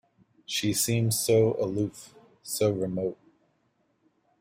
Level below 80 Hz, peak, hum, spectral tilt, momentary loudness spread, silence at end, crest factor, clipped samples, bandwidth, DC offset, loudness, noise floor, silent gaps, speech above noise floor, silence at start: -62 dBFS; -12 dBFS; none; -4.5 dB/octave; 12 LU; 1.25 s; 16 dB; under 0.1%; 16 kHz; under 0.1%; -27 LUFS; -71 dBFS; none; 45 dB; 0.5 s